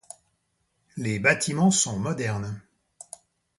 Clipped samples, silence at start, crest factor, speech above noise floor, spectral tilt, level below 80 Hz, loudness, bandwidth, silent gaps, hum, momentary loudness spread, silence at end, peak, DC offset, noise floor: under 0.1%; 0.95 s; 22 dB; 49 dB; -4 dB/octave; -58 dBFS; -24 LUFS; 11.5 kHz; none; none; 23 LU; 1 s; -6 dBFS; under 0.1%; -74 dBFS